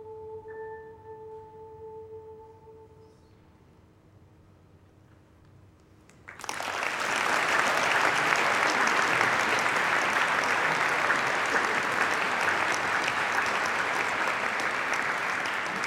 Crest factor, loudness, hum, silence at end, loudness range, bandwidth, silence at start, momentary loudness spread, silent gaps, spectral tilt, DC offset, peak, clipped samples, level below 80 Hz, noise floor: 22 dB; -25 LUFS; none; 0 s; 17 LU; 16 kHz; 0 s; 21 LU; none; -2 dB/octave; under 0.1%; -6 dBFS; under 0.1%; -66 dBFS; -57 dBFS